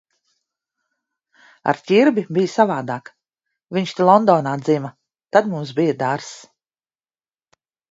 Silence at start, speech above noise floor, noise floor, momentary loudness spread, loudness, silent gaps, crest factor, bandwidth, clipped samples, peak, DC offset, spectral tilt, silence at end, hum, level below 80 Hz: 1.65 s; over 72 dB; under -90 dBFS; 14 LU; -18 LUFS; none; 20 dB; 8 kHz; under 0.1%; 0 dBFS; under 0.1%; -6.5 dB/octave; 1.5 s; none; -70 dBFS